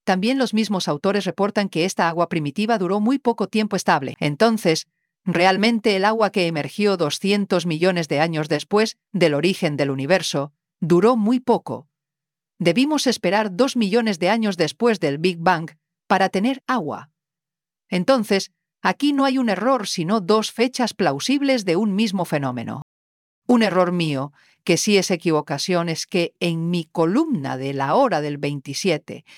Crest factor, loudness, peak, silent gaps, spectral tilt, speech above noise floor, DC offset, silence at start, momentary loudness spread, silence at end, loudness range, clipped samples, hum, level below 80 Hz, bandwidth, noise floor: 18 dB; -20 LUFS; -2 dBFS; 22.82-23.42 s; -5 dB/octave; over 70 dB; under 0.1%; 0.05 s; 7 LU; 0.2 s; 2 LU; under 0.1%; none; -68 dBFS; 16 kHz; under -90 dBFS